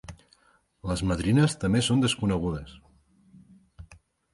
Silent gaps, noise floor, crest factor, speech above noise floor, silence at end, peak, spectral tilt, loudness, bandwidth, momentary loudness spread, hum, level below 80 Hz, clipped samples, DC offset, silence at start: none; -64 dBFS; 20 dB; 39 dB; 0.4 s; -8 dBFS; -5.5 dB/octave; -26 LUFS; 11.5 kHz; 16 LU; none; -46 dBFS; under 0.1%; under 0.1%; 0.1 s